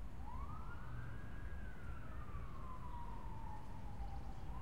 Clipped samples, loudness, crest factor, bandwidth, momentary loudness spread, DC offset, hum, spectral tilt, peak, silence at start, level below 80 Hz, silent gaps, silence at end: under 0.1%; -52 LUFS; 12 dB; 16 kHz; 1 LU; 0.4%; none; -7 dB/octave; -34 dBFS; 0 s; -52 dBFS; none; 0 s